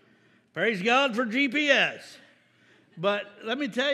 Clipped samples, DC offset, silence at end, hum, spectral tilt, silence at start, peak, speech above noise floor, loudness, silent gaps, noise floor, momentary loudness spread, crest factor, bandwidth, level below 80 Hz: under 0.1%; under 0.1%; 0 s; none; -4 dB/octave; 0.55 s; -6 dBFS; 36 dB; -25 LUFS; none; -62 dBFS; 11 LU; 22 dB; 13 kHz; -88 dBFS